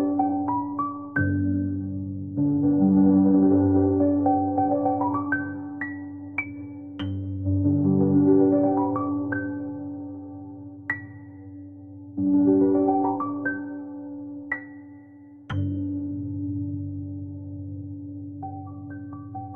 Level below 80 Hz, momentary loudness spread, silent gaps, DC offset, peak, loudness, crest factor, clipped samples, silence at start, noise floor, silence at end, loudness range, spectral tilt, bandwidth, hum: -62 dBFS; 19 LU; none; under 0.1%; -8 dBFS; -24 LUFS; 16 dB; under 0.1%; 0 s; -47 dBFS; 0 s; 11 LU; -11.5 dB/octave; 3.4 kHz; none